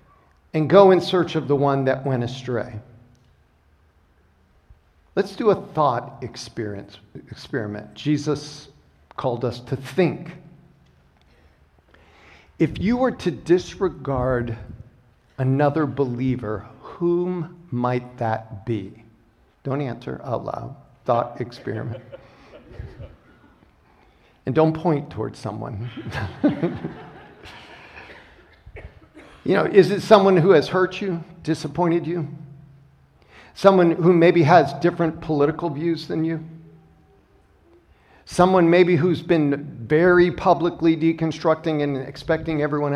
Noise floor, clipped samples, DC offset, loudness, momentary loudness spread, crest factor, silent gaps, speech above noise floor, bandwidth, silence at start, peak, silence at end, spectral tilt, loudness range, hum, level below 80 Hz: -59 dBFS; under 0.1%; under 0.1%; -21 LUFS; 22 LU; 22 dB; none; 38 dB; 11 kHz; 0.55 s; 0 dBFS; 0 s; -7.5 dB/octave; 11 LU; none; -50 dBFS